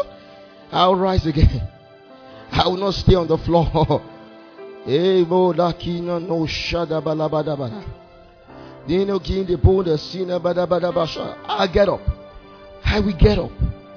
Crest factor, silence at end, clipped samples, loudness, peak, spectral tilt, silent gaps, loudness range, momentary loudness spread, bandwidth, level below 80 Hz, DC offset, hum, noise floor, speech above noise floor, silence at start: 18 dB; 0 s; under 0.1%; -20 LUFS; -2 dBFS; -7.5 dB/octave; none; 4 LU; 13 LU; 5.4 kHz; -30 dBFS; under 0.1%; none; -46 dBFS; 27 dB; 0 s